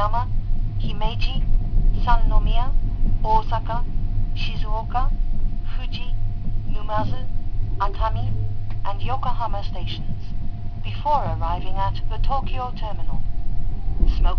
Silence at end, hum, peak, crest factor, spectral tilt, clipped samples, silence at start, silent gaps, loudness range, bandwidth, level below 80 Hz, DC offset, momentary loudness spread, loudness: 0 s; none; -2 dBFS; 16 dB; -8 dB/octave; under 0.1%; 0 s; none; 4 LU; 5.4 kHz; -20 dBFS; under 0.1%; 9 LU; -27 LUFS